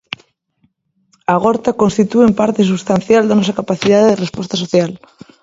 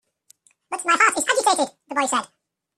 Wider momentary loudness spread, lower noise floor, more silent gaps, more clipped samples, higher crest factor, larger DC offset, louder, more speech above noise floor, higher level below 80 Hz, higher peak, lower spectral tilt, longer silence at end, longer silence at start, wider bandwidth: about the same, 11 LU vs 9 LU; about the same, -61 dBFS vs -58 dBFS; neither; neither; second, 14 dB vs 20 dB; neither; first, -14 LUFS vs -20 LUFS; first, 48 dB vs 38 dB; first, -50 dBFS vs -70 dBFS; about the same, 0 dBFS vs -2 dBFS; first, -6 dB/octave vs 0 dB/octave; about the same, 0.45 s vs 0.5 s; first, 1.3 s vs 0.7 s; second, 7.8 kHz vs 15 kHz